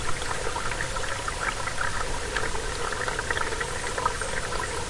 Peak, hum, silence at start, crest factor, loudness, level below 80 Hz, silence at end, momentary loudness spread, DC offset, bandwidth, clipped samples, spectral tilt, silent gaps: -10 dBFS; none; 0 s; 18 dB; -29 LUFS; -36 dBFS; 0 s; 2 LU; under 0.1%; 11.5 kHz; under 0.1%; -2.5 dB/octave; none